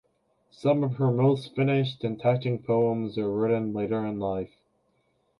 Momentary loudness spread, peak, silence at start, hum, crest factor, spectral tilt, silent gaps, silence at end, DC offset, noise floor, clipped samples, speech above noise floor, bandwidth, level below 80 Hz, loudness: 6 LU; -10 dBFS; 0.6 s; none; 16 dB; -9 dB/octave; none; 0.95 s; under 0.1%; -70 dBFS; under 0.1%; 45 dB; 10.5 kHz; -62 dBFS; -27 LUFS